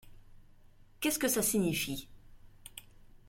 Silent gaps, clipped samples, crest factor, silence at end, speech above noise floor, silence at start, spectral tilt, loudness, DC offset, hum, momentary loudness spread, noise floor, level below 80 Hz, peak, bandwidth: none; under 0.1%; 20 dB; 0.25 s; 26 dB; 0.05 s; -3.5 dB/octave; -32 LUFS; under 0.1%; none; 22 LU; -58 dBFS; -58 dBFS; -18 dBFS; 16.5 kHz